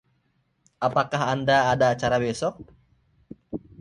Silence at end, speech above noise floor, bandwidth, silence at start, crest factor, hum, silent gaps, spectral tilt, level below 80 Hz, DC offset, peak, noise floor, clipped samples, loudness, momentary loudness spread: 0.25 s; 47 dB; 11 kHz; 0.8 s; 20 dB; none; none; -5 dB/octave; -54 dBFS; under 0.1%; -6 dBFS; -69 dBFS; under 0.1%; -23 LUFS; 16 LU